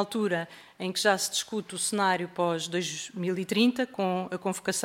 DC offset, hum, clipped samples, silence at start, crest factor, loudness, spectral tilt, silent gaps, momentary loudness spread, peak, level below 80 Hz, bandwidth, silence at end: under 0.1%; none; under 0.1%; 0 s; 20 dB; -28 LUFS; -3.5 dB/octave; none; 8 LU; -10 dBFS; -74 dBFS; 16 kHz; 0 s